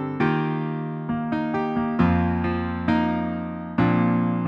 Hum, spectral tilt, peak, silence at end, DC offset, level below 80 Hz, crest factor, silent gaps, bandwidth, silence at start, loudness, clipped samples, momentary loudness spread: none; -9.5 dB/octave; -6 dBFS; 0 s; under 0.1%; -44 dBFS; 16 dB; none; 5.8 kHz; 0 s; -24 LUFS; under 0.1%; 8 LU